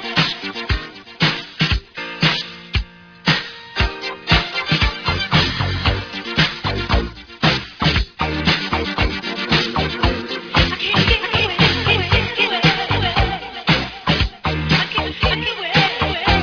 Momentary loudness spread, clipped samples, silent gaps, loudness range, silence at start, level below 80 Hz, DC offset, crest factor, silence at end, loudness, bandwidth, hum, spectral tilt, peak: 8 LU; under 0.1%; none; 4 LU; 0 s; -28 dBFS; under 0.1%; 18 dB; 0 s; -18 LUFS; 5.4 kHz; none; -5 dB/octave; 0 dBFS